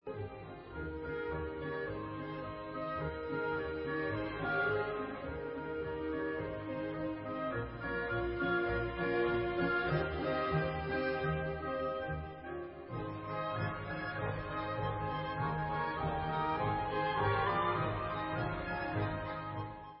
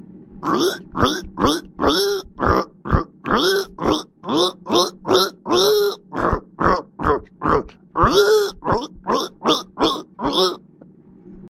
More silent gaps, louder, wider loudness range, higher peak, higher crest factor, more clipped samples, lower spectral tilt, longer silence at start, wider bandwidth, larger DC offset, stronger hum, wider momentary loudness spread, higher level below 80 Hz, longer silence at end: neither; second, -37 LUFS vs -20 LUFS; first, 5 LU vs 1 LU; second, -20 dBFS vs 0 dBFS; about the same, 16 dB vs 20 dB; neither; about the same, -5 dB/octave vs -4.5 dB/octave; about the same, 0.05 s vs 0.15 s; second, 5.6 kHz vs 16.5 kHz; neither; neither; first, 9 LU vs 6 LU; second, -52 dBFS vs -36 dBFS; about the same, 0 s vs 0 s